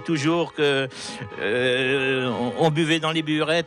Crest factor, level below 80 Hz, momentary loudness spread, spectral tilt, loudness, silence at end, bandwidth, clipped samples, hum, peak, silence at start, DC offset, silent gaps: 12 dB; -66 dBFS; 7 LU; -5 dB/octave; -22 LUFS; 0 s; 11.5 kHz; under 0.1%; none; -10 dBFS; 0 s; under 0.1%; none